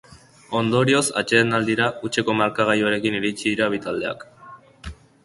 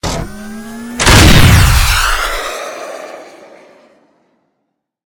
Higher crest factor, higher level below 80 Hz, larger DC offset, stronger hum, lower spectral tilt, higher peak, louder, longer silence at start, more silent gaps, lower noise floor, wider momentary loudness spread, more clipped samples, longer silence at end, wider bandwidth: first, 20 dB vs 12 dB; second, -52 dBFS vs -18 dBFS; neither; neither; about the same, -4.5 dB/octave vs -4 dB/octave; about the same, -2 dBFS vs 0 dBFS; second, -21 LUFS vs -9 LUFS; about the same, 0.1 s vs 0.05 s; neither; second, -45 dBFS vs -70 dBFS; second, 16 LU vs 22 LU; second, under 0.1% vs 0.8%; second, 0.3 s vs 1.75 s; second, 11.5 kHz vs over 20 kHz